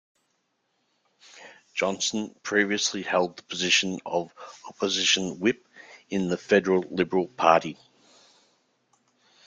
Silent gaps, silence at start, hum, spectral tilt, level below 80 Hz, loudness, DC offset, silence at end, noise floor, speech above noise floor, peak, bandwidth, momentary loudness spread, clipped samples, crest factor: none; 1.35 s; none; -3 dB/octave; -68 dBFS; -25 LUFS; under 0.1%; 1.7 s; -74 dBFS; 49 dB; -4 dBFS; 9.6 kHz; 11 LU; under 0.1%; 24 dB